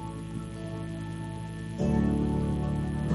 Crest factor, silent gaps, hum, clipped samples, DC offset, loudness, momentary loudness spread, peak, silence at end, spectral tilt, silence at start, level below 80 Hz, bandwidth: 16 dB; none; none; under 0.1%; under 0.1%; -31 LUFS; 11 LU; -14 dBFS; 0 s; -8 dB/octave; 0 s; -40 dBFS; 11.5 kHz